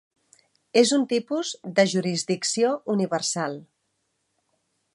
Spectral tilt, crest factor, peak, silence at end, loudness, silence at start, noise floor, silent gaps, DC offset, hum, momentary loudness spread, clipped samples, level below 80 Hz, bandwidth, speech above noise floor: -4 dB/octave; 20 dB; -6 dBFS; 1.3 s; -24 LUFS; 0.75 s; -75 dBFS; none; under 0.1%; none; 9 LU; under 0.1%; -78 dBFS; 11.5 kHz; 51 dB